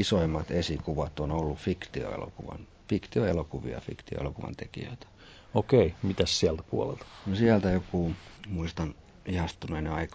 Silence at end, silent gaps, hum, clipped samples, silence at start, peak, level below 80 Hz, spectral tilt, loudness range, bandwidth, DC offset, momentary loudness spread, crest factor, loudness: 0 s; none; none; under 0.1%; 0 s; -8 dBFS; -44 dBFS; -6 dB/octave; 7 LU; 8 kHz; under 0.1%; 16 LU; 22 dB; -30 LUFS